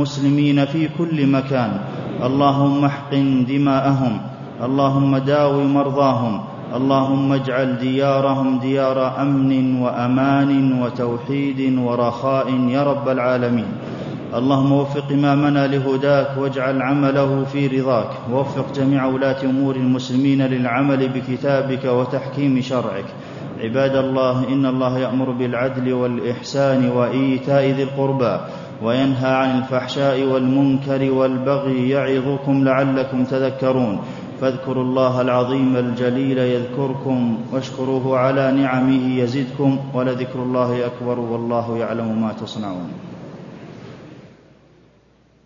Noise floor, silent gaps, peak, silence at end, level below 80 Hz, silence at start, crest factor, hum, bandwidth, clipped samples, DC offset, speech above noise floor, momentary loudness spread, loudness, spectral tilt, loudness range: -54 dBFS; none; -2 dBFS; 1.2 s; -58 dBFS; 0 s; 16 dB; none; 7.4 kHz; under 0.1%; under 0.1%; 36 dB; 7 LU; -19 LUFS; -8 dB/octave; 3 LU